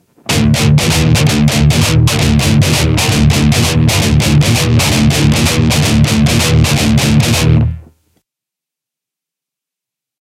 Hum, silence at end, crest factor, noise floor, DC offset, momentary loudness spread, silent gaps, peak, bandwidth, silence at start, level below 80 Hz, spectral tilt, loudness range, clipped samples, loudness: none; 2.4 s; 10 dB; -84 dBFS; under 0.1%; 1 LU; none; 0 dBFS; 16 kHz; 0.3 s; -22 dBFS; -5 dB/octave; 4 LU; under 0.1%; -10 LUFS